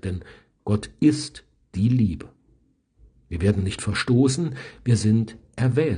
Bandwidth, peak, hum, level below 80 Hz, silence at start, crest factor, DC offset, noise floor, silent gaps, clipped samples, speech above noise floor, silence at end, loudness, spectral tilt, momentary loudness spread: 10 kHz; -6 dBFS; none; -48 dBFS; 0.05 s; 18 dB; under 0.1%; -62 dBFS; none; under 0.1%; 40 dB; 0 s; -23 LUFS; -6.5 dB/octave; 15 LU